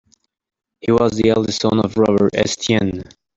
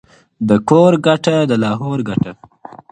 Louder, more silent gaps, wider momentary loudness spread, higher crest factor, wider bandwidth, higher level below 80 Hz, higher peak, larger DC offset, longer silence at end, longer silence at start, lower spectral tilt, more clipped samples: second, -17 LUFS vs -14 LUFS; neither; second, 7 LU vs 10 LU; about the same, 16 dB vs 14 dB; second, 8 kHz vs 9.6 kHz; first, -46 dBFS vs -52 dBFS; about the same, -2 dBFS vs 0 dBFS; neither; second, 0.35 s vs 0.6 s; first, 0.85 s vs 0.4 s; second, -5.5 dB/octave vs -7 dB/octave; neither